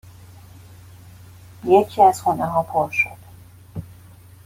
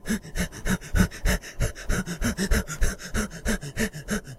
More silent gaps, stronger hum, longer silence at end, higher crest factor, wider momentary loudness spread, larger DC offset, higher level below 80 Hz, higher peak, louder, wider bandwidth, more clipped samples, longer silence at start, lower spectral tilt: neither; neither; first, 0.5 s vs 0 s; about the same, 20 dB vs 20 dB; first, 21 LU vs 6 LU; neither; second, -54 dBFS vs -30 dBFS; first, -2 dBFS vs -6 dBFS; first, -19 LUFS vs -28 LUFS; about the same, 16.5 kHz vs 16 kHz; neither; first, 1.65 s vs 0.05 s; first, -6 dB/octave vs -4.5 dB/octave